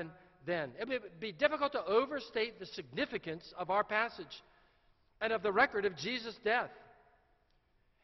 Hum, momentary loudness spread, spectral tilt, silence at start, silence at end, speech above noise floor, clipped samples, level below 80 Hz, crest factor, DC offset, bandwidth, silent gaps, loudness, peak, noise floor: none; 14 LU; -1.5 dB/octave; 0 s; 1.2 s; 37 dB; under 0.1%; -70 dBFS; 24 dB; under 0.1%; 6.2 kHz; none; -35 LUFS; -14 dBFS; -73 dBFS